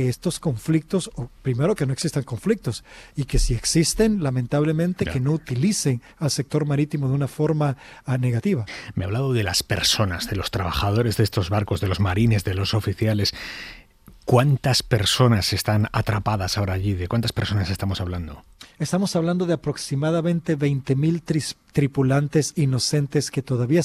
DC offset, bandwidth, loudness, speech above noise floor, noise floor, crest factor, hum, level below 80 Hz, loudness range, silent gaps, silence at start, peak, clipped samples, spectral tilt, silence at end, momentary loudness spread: under 0.1%; 15.5 kHz; -22 LUFS; 27 dB; -49 dBFS; 18 dB; none; -38 dBFS; 3 LU; none; 0 s; -4 dBFS; under 0.1%; -5.5 dB/octave; 0 s; 7 LU